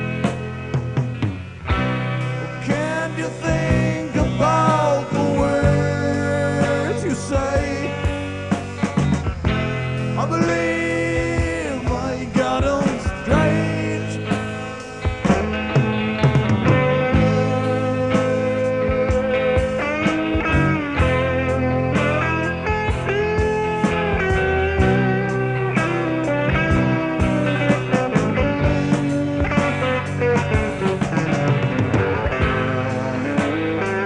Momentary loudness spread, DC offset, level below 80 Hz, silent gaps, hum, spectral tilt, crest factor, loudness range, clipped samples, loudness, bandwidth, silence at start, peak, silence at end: 6 LU; 0.1%; -32 dBFS; none; none; -6.5 dB/octave; 16 dB; 3 LU; under 0.1%; -20 LUFS; 10.5 kHz; 0 s; -2 dBFS; 0 s